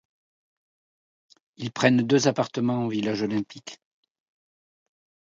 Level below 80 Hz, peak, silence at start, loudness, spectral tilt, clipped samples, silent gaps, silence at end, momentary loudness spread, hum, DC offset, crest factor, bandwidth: -68 dBFS; -4 dBFS; 1.6 s; -24 LUFS; -5.5 dB/octave; under 0.1%; none; 1.5 s; 17 LU; none; under 0.1%; 24 dB; 7.8 kHz